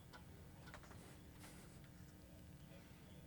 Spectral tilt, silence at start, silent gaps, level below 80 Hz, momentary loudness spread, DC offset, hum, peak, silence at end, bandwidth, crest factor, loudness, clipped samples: -5 dB/octave; 0 s; none; -68 dBFS; 2 LU; under 0.1%; none; -40 dBFS; 0 s; 19 kHz; 20 dB; -60 LUFS; under 0.1%